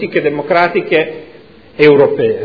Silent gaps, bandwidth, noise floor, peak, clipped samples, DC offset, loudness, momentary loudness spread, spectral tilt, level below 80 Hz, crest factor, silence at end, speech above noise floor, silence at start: none; 5.4 kHz; -39 dBFS; 0 dBFS; 0.3%; under 0.1%; -12 LUFS; 9 LU; -8 dB/octave; -52 dBFS; 12 dB; 0 s; 28 dB; 0 s